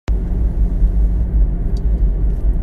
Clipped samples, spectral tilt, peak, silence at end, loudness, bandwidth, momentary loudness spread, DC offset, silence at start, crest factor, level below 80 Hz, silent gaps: under 0.1%; -9.5 dB/octave; -4 dBFS; 0 s; -19 LUFS; 2.6 kHz; 3 LU; under 0.1%; 0.1 s; 12 dB; -16 dBFS; none